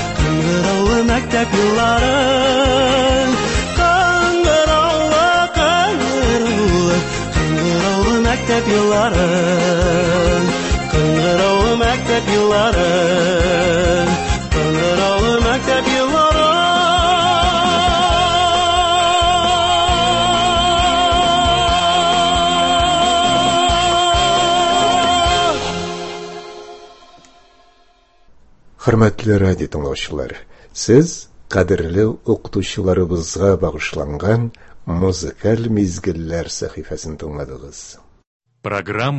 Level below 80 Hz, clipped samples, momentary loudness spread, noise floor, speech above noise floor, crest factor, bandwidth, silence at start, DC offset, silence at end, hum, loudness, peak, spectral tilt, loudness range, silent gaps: -28 dBFS; under 0.1%; 10 LU; -52 dBFS; 36 dB; 16 dB; 8.6 kHz; 0 s; under 0.1%; 0 s; none; -15 LUFS; 0 dBFS; -4.5 dB/octave; 7 LU; 38.27-38.40 s